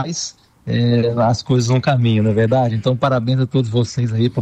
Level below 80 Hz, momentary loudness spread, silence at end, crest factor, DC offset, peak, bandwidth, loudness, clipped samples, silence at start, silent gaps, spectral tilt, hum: -48 dBFS; 8 LU; 0 s; 10 dB; under 0.1%; -6 dBFS; 8.4 kHz; -17 LUFS; under 0.1%; 0 s; none; -6.5 dB/octave; none